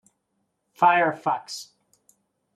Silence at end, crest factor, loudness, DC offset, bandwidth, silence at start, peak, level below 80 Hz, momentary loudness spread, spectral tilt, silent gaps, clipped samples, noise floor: 0.95 s; 20 dB; -22 LUFS; under 0.1%; 13.5 kHz; 0.8 s; -6 dBFS; -80 dBFS; 18 LU; -4 dB/octave; none; under 0.1%; -75 dBFS